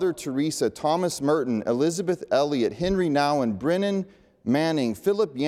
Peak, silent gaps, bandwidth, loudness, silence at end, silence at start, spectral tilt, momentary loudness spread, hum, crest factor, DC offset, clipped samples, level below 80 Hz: -10 dBFS; none; 15.5 kHz; -24 LUFS; 0 s; 0 s; -5.5 dB/octave; 5 LU; none; 14 dB; under 0.1%; under 0.1%; -52 dBFS